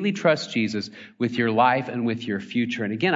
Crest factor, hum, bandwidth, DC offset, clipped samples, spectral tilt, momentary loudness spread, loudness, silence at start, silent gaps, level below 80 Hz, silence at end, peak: 18 dB; none; 7.8 kHz; under 0.1%; under 0.1%; -6 dB/octave; 9 LU; -24 LUFS; 0 s; none; -70 dBFS; 0 s; -6 dBFS